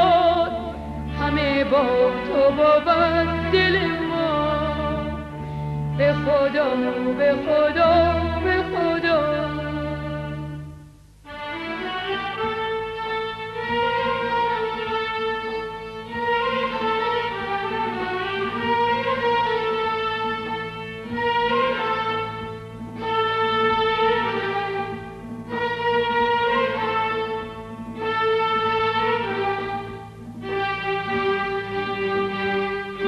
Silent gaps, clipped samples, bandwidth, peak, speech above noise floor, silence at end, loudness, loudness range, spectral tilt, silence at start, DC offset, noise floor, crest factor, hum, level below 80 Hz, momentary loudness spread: none; under 0.1%; 12.5 kHz; -6 dBFS; 27 dB; 0 s; -22 LUFS; 6 LU; -6.5 dB/octave; 0 s; under 0.1%; -46 dBFS; 16 dB; 50 Hz at -55 dBFS; -42 dBFS; 12 LU